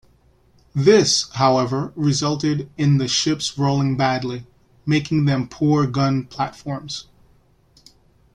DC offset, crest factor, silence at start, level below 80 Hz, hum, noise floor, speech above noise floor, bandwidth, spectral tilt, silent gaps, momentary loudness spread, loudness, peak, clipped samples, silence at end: under 0.1%; 18 dB; 0.75 s; -52 dBFS; none; -56 dBFS; 37 dB; 10.5 kHz; -5 dB/octave; none; 13 LU; -20 LUFS; -2 dBFS; under 0.1%; 1.35 s